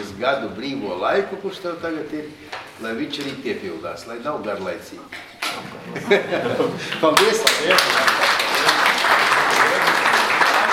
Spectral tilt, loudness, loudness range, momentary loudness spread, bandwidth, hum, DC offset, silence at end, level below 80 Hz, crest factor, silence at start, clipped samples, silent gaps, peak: -2 dB/octave; -18 LUFS; 13 LU; 16 LU; 16.5 kHz; none; under 0.1%; 0 s; -60 dBFS; 20 dB; 0 s; under 0.1%; none; 0 dBFS